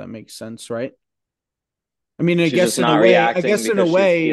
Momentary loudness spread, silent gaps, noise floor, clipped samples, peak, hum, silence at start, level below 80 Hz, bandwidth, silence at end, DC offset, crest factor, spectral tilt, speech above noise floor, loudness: 20 LU; none; -85 dBFS; under 0.1%; 0 dBFS; none; 0 s; -64 dBFS; 12.5 kHz; 0 s; under 0.1%; 18 dB; -5 dB/octave; 68 dB; -16 LUFS